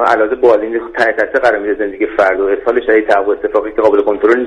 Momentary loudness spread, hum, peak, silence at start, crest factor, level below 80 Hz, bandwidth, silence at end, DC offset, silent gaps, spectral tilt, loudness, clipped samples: 5 LU; none; 0 dBFS; 0 s; 12 dB; -44 dBFS; 9.2 kHz; 0 s; under 0.1%; none; -5.5 dB/octave; -13 LUFS; under 0.1%